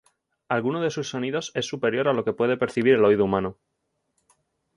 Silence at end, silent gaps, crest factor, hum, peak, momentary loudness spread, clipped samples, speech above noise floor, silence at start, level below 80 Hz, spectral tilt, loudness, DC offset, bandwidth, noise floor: 1.25 s; none; 18 dB; none; -6 dBFS; 9 LU; under 0.1%; 53 dB; 0.5 s; -60 dBFS; -5.5 dB/octave; -24 LUFS; under 0.1%; 11 kHz; -76 dBFS